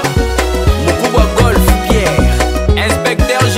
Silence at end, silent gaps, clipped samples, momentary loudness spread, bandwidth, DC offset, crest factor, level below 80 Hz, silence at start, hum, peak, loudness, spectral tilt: 0 s; none; under 0.1%; 3 LU; 16.5 kHz; under 0.1%; 10 dB; -16 dBFS; 0 s; none; 0 dBFS; -12 LUFS; -5 dB/octave